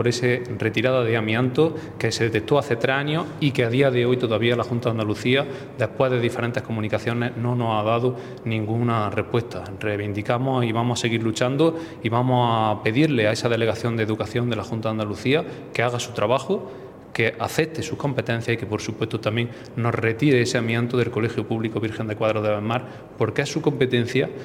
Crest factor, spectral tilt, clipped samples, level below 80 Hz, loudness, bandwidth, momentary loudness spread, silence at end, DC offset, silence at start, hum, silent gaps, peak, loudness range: 20 dB; -6 dB/octave; under 0.1%; -58 dBFS; -23 LUFS; 14.5 kHz; 7 LU; 0 s; under 0.1%; 0 s; none; none; -2 dBFS; 3 LU